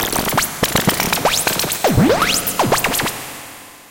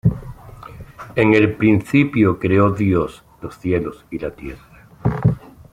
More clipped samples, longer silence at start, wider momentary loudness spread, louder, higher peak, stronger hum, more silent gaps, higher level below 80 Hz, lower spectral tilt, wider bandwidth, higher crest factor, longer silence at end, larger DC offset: neither; about the same, 0 s vs 0.05 s; second, 15 LU vs 23 LU; about the same, -16 LUFS vs -18 LUFS; about the same, -4 dBFS vs -2 dBFS; neither; neither; about the same, -38 dBFS vs -40 dBFS; second, -3 dB/octave vs -8.5 dB/octave; first, 17.5 kHz vs 14.5 kHz; about the same, 14 dB vs 16 dB; second, 0.1 s vs 0.35 s; neither